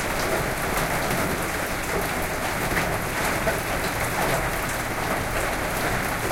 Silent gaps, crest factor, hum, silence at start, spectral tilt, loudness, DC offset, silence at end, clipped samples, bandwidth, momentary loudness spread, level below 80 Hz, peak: none; 16 dB; none; 0 s; -3.5 dB/octave; -25 LUFS; under 0.1%; 0 s; under 0.1%; 17 kHz; 2 LU; -36 dBFS; -10 dBFS